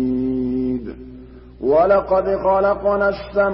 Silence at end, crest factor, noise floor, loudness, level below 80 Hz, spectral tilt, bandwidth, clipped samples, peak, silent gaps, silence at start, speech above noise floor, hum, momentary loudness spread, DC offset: 0 s; 14 dB; -39 dBFS; -18 LUFS; -40 dBFS; -12 dB/octave; 5.8 kHz; under 0.1%; -6 dBFS; none; 0 s; 23 dB; 60 Hz at -40 dBFS; 13 LU; under 0.1%